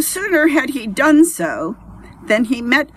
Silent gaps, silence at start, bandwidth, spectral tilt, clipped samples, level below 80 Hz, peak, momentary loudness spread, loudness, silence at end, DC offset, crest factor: none; 0 s; 14 kHz; -3.5 dB/octave; under 0.1%; -48 dBFS; 0 dBFS; 12 LU; -15 LUFS; 0.1 s; under 0.1%; 16 dB